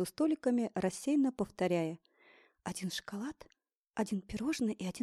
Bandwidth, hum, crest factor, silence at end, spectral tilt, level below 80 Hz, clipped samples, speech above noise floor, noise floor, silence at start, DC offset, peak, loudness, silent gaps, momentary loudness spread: 15 kHz; none; 16 dB; 0 s; -5.5 dB/octave; -64 dBFS; under 0.1%; 31 dB; -65 dBFS; 0 s; under 0.1%; -20 dBFS; -35 LUFS; 3.77-3.84 s; 13 LU